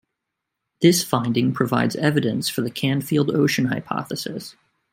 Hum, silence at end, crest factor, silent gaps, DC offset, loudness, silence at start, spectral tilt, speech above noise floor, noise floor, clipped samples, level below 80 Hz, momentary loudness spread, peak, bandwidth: none; 0.4 s; 20 dB; none; under 0.1%; -21 LUFS; 0.8 s; -5 dB/octave; 60 dB; -81 dBFS; under 0.1%; -62 dBFS; 11 LU; -2 dBFS; 16.5 kHz